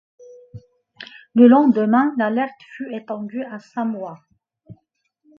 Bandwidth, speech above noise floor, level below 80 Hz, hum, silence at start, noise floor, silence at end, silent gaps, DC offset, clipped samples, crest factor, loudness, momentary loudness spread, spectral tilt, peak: 5.4 kHz; 50 dB; -66 dBFS; none; 0.55 s; -68 dBFS; 0.65 s; none; under 0.1%; under 0.1%; 20 dB; -18 LUFS; 22 LU; -8.5 dB/octave; 0 dBFS